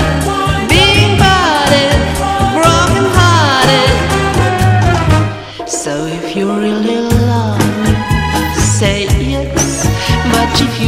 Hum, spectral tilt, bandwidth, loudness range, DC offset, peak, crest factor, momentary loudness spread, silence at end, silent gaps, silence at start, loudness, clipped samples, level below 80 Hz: none; -4.5 dB/octave; 15.5 kHz; 5 LU; under 0.1%; 0 dBFS; 10 dB; 7 LU; 0 s; none; 0 s; -11 LUFS; 0.4%; -22 dBFS